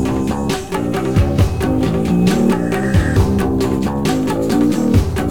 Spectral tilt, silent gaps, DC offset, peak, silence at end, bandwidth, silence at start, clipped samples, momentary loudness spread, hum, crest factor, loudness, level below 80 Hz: -7 dB/octave; none; 2%; -2 dBFS; 0 s; 18 kHz; 0 s; under 0.1%; 5 LU; none; 14 dB; -16 LUFS; -26 dBFS